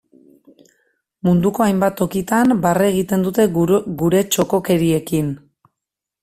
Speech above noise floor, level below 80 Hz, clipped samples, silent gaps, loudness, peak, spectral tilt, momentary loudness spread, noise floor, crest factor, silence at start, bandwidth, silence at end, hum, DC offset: 67 dB; -48 dBFS; under 0.1%; none; -17 LUFS; -2 dBFS; -6 dB/octave; 6 LU; -83 dBFS; 16 dB; 1.25 s; 16 kHz; 0.85 s; none; under 0.1%